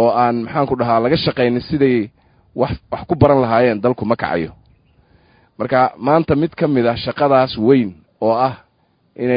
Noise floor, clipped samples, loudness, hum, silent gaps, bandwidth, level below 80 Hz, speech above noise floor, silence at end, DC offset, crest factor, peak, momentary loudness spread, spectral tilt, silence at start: -60 dBFS; under 0.1%; -16 LUFS; none; none; 5.2 kHz; -42 dBFS; 45 dB; 0 s; under 0.1%; 16 dB; 0 dBFS; 9 LU; -10.5 dB/octave; 0 s